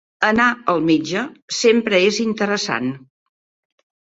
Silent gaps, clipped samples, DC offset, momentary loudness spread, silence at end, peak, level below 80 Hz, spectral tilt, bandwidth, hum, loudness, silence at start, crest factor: 1.42-1.48 s; under 0.1%; under 0.1%; 10 LU; 1.2 s; -2 dBFS; -58 dBFS; -4 dB/octave; 8 kHz; none; -18 LUFS; 0.2 s; 18 dB